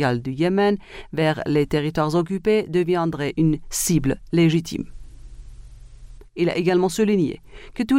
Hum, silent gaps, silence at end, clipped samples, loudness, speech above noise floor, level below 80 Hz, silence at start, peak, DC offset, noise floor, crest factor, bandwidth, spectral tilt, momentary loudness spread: none; none; 0 s; under 0.1%; -21 LUFS; 21 dB; -42 dBFS; 0 s; -6 dBFS; under 0.1%; -41 dBFS; 16 dB; 16 kHz; -5.5 dB/octave; 11 LU